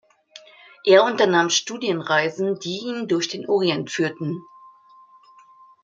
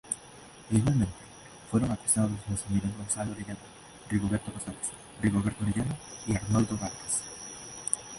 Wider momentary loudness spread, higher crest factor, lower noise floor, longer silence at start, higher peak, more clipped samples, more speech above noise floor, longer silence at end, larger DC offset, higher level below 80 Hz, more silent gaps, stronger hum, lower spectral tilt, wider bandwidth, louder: second, 12 LU vs 15 LU; about the same, 20 dB vs 24 dB; about the same, -51 dBFS vs -50 dBFS; first, 0.35 s vs 0.05 s; first, -2 dBFS vs -6 dBFS; neither; first, 31 dB vs 21 dB; first, 1.4 s vs 0 s; neither; second, -72 dBFS vs -50 dBFS; neither; neither; second, -3.5 dB/octave vs -5 dB/octave; second, 7.8 kHz vs 11.5 kHz; first, -21 LUFS vs -31 LUFS